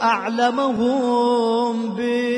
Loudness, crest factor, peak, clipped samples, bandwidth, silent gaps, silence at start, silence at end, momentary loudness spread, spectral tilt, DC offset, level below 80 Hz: -20 LUFS; 14 dB; -6 dBFS; under 0.1%; 10.5 kHz; none; 0 s; 0 s; 4 LU; -5 dB/octave; under 0.1%; -62 dBFS